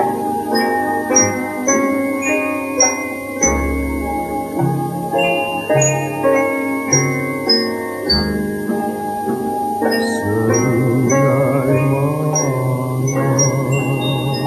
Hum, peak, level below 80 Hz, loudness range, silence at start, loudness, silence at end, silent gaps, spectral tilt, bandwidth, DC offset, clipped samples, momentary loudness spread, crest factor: none; 0 dBFS; -36 dBFS; 2 LU; 0 s; -17 LUFS; 0 s; none; -4 dB/octave; 13 kHz; under 0.1%; under 0.1%; 6 LU; 16 dB